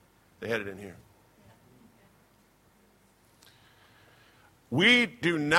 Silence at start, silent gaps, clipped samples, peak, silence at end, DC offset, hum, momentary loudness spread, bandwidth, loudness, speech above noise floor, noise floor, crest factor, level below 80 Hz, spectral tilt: 0.4 s; none; under 0.1%; -4 dBFS; 0 s; under 0.1%; none; 23 LU; 16.5 kHz; -25 LUFS; 37 dB; -63 dBFS; 26 dB; -68 dBFS; -4 dB/octave